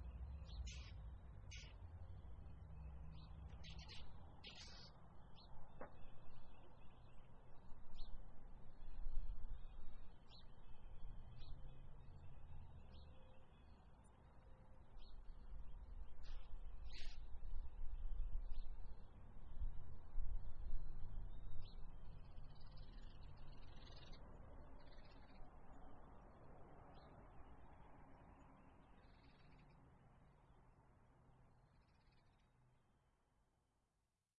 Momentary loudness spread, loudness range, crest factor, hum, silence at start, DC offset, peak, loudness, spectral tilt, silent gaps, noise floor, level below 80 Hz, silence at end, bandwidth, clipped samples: 12 LU; 9 LU; 20 dB; none; 0 s; under 0.1%; -28 dBFS; -60 LUFS; -5 dB/octave; none; -89 dBFS; -54 dBFS; 2.6 s; 6 kHz; under 0.1%